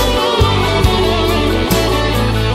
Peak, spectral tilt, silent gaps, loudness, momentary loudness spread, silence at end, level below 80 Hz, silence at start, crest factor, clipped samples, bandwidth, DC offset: -2 dBFS; -5 dB/octave; none; -14 LUFS; 2 LU; 0 s; -20 dBFS; 0 s; 12 dB; under 0.1%; 16 kHz; under 0.1%